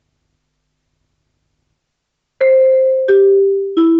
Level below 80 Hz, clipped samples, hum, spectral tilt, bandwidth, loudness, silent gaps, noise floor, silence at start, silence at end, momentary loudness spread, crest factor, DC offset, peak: -70 dBFS; under 0.1%; none; -7 dB/octave; 4.3 kHz; -12 LUFS; none; -73 dBFS; 2.4 s; 0 s; 4 LU; 12 dB; under 0.1%; -4 dBFS